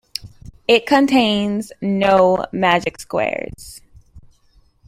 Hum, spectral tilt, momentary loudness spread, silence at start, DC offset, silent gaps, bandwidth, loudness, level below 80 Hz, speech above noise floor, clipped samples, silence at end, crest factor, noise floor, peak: none; -5 dB/octave; 17 LU; 0.2 s; under 0.1%; none; 15.5 kHz; -17 LUFS; -48 dBFS; 38 dB; under 0.1%; 0.7 s; 18 dB; -55 dBFS; -2 dBFS